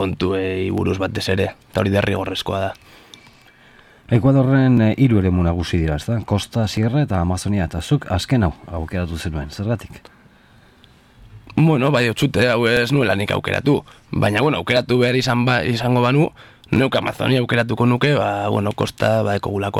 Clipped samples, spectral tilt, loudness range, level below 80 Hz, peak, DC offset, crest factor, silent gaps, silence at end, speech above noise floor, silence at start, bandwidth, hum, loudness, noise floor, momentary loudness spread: under 0.1%; -6.5 dB/octave; 5 LU; -40 dBFS; -4 dBFS; under 0.1%; 16 dB; none; 0 s; 32 dB; 0 s; 15 kHz; none; -19 LUFS; -50 dBFS; 9 LU